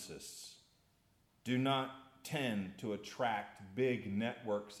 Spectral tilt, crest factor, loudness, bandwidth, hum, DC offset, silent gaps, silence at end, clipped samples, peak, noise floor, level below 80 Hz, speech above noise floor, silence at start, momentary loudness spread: -5 dB/octave; 18 dB; -39 LUFS; 15.5 kHz; none; under 0.1%; none; 0 s; under 0.1%; -22 dBFS; -73 dBFS; -78 dBFS; 35 dB; 0 s; 14 LU